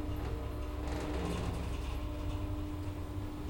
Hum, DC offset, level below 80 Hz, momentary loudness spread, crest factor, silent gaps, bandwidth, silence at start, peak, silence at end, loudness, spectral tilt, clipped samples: none; under 0.1%; -40 dBFS; 4 LU; 14 dB; none; 16.5 kHz; 0 s; -24 dBFS; 0 s; -39 LUFS; -6.5 dB/octave; under 0.1%